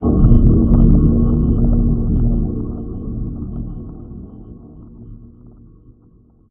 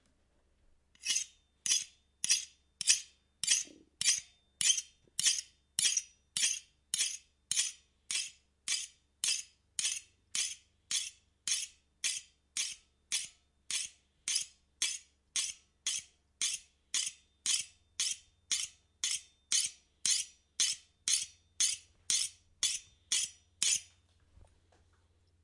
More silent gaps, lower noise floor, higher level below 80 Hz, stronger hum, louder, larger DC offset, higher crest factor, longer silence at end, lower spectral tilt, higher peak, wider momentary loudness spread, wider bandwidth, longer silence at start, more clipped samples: neither; second, -49 dBFS vs -72 dBFS; first, -18 dBFS vs -74 dBFS; neither; first, -16 LUFS vs -34 LUFS; neither; second, 16 dB vs 28 dB; second, 1.25 s vs 1.6 s; first, -14.5 dB/octave vs 3.5 dB/octave; first, 0 dBFS vs -10 dBFS; first, 23 LU vs 12 LU; second, 1.5 kHz vs 12 kHz; second, 0 s vs 1.05 s; neither